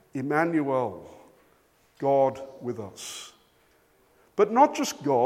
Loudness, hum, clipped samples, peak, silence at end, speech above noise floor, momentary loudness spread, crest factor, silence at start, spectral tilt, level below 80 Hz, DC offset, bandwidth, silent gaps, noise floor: -26 LUFS; none; under 0.1%; -6 dBFS; 0 s; 38 dB; 16 LU; 20 dB; 0.15 s; -5 dB/octave; -72 dBFS; under 0.1%; 16 kHz; none; -63 dBFS